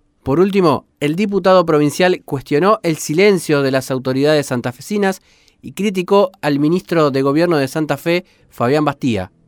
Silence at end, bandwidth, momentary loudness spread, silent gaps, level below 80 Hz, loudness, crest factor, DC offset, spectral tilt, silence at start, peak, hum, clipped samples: 0.2 s; 20 kHz; 8 LU; none; -52 dBFS; -16 LUFS; 14 dB; under 0.1%; -6 dB/octave; 0.25 s; -2 dBFS; none; under 0.1%